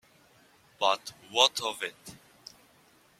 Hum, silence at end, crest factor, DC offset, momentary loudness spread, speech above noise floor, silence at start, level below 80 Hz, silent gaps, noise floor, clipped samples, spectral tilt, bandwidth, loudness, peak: none; 1.05 s; 28 dB; under 0.1%; 26 LU; 33 dB; 0.8 s; -74 dBFS; none; -62 dBFS; under 0.1%; 0 dB/octave; 16 kHz; -28 LUFS; -4 dBFS